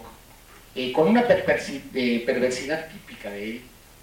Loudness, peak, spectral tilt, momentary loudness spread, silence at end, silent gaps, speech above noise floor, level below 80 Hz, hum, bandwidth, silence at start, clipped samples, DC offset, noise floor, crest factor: -24 LUFS; -6 dBFS; -5 dB/octave; 18 LU; 0.35 s; none; 25 dB; -54 dBFS; none; 17 kHz; 0 s; under 0.1%; under 0.1%; -49 dBFS; 20 dB